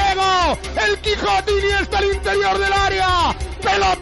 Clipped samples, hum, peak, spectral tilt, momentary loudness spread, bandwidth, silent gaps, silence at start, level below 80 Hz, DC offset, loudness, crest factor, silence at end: under 0.1%; none; -8 dBFS; -3.5 dB/octave; 3 LU; 12 kHz; none; 0 s; -30 dBFS; under 0.1%; -17 LUFS; 10 dB; 0 s